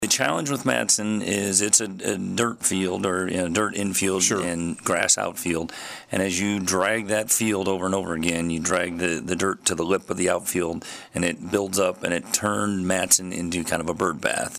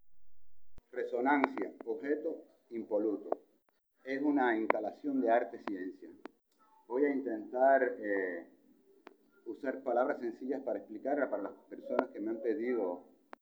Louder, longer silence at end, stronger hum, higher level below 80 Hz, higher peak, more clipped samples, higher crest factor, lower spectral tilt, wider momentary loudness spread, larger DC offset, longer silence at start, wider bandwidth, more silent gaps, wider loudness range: first, -23 LUFS vs -35 LUFS; second, 0 s vs 0.4 s; neither; first, -56 dBFS vs -76 dBFS; about the same, -6 dBFS vs -6 dBFS; neither; second, 18 dB vs 28 dB; second, -3 dB/octave vs -7 dB/octave; second, 8 LU vs 16 LU; neither; about the same, 0 s vs 0.05 s; second, 15.5 kHz vs over 20 kHz; neither; about the same, 3 LU vs 4 LU